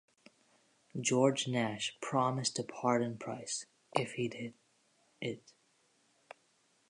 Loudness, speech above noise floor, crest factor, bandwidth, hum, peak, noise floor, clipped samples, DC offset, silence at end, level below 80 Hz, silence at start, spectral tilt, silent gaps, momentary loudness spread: -35 LUFS; 38 dB; 26 dB; 11 kHz; none; -12 dBFS; -73 dBFS; under 0.1%; under 0.1%; 1.5 s; -80 dBFS; 0.95 s; -4 dB/octave; none; 13 LU